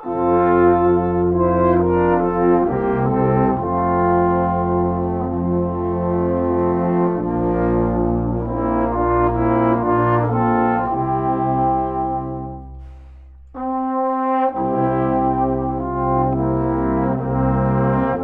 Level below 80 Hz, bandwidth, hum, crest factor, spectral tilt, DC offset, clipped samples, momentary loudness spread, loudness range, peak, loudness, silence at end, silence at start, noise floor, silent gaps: -34 dBFS; 3.7 kHz; none; 14 dB; -12 dB/octave; under 0.1%; under 0.1%; 6 LU; 5 LU; -2 dBFS; -18 LUFS; 0 s; 0 s; -40 dBFS; none